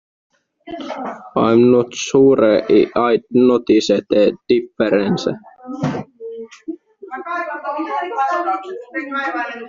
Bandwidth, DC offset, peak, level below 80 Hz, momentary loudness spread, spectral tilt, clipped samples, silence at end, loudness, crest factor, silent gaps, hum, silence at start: 7.6 kHz; under 0.1%; 0 dBFS; -56 dBFS; 19 LU; -5 dB/octave; under 0.1%; 0 s; -17 LUFS; 16 dB; none; none; 0.65 s